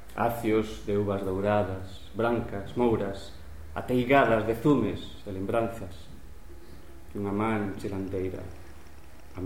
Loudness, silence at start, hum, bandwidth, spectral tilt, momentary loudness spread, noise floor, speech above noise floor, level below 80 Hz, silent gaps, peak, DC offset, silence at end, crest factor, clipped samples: -28 LUFS; 0 s; none; 17 kHz; -7 dB/octave; 19 LU; -50 dBFS; 22 dB; -48 dBFS; none; -8 dBFS; 0.8%; 0 s; 20 dB; under 0.1%